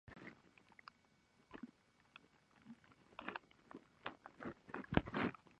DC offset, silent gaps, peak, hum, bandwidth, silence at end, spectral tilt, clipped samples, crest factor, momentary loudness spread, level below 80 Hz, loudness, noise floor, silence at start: under 0.1%; none; -14 dBFS; none; 9.4 kHz; 0.05 s; -7.5 dB/octave; under 0.1%; 36 dB; 24 LU; -64 dBFS; -46 LUFS; -74 dBFS; 0.05 s